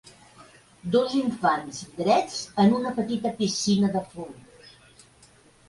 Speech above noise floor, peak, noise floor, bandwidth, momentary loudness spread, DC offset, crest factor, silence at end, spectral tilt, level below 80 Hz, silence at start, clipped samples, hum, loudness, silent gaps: 32 dB; -8 dBFS; -56 dBFS; 11.5 kHz; 16 LU; under 0.1%; 18 dB; 1 s; -5 dB/octave; -62 dBFS; 0.4 s; under 0.1%; none; -25 LUFS; none